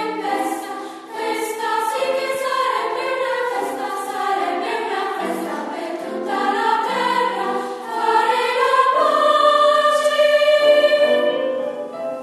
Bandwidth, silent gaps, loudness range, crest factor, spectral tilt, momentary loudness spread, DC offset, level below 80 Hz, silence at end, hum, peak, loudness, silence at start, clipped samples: 13.5 kHz; none; 8 LU; 16 dB; -2.5 dB/octave; 12 LU; under 0.1%; -80 dBFS; 0 s; none; -2 dBFS; -19 LUFS; 0 s; under 0.1%